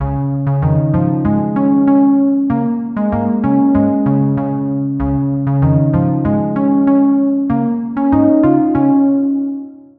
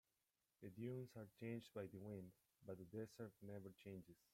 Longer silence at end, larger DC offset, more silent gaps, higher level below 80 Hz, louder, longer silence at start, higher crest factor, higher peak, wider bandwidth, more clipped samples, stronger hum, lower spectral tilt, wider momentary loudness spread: about the same, 0.2 s vs 0.2 s; neither; neither; first, -34 dBFS vs -86 dBFS; first, -14 LUFS vs -56 LUFS; second, 0 s vs 0.6 s; second, 12 dB vs 18 dB; first, -2 dBFS vs -38 dBFS; second, 3 kHz vs 16.5 kHz; neither; neither; first, -13.5 dB/octave vs -7.5 dB/octave; about the same, 7 LU vs 9 LU